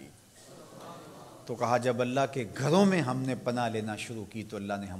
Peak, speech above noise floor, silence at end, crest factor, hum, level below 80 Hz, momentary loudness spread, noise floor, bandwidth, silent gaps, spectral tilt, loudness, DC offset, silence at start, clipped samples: -10 dBFS; 24 dB; 0 s; 22 dB; none; -68 dBFS; 22 LU; -53 dBFS; 15 kHz; none; -6 dB/octave; -30 LUFS; under 0.1%; 0 s; under 0.1%